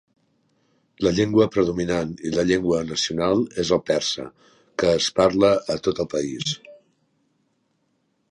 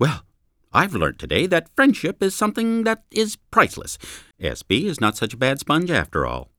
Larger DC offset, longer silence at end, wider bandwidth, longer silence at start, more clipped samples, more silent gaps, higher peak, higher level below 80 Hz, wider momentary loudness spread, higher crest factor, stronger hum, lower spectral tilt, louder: neither; first, 1.55 s vs 0.15 s; second, 11 kHz vs 19 kHz; first, 1 s vs 0 s; neither; neither; second, -4 dBFS vs 0 dBFS; second, -50 dBFS vs -44 dBFS; second, 8 LU vs 11 LU; about the same, 20 dB vs 22 dB; neither; about the same, -4.5 dB/octave vs -4.5 dB/octave; about the same, -22 LUFS vs -21 LUFS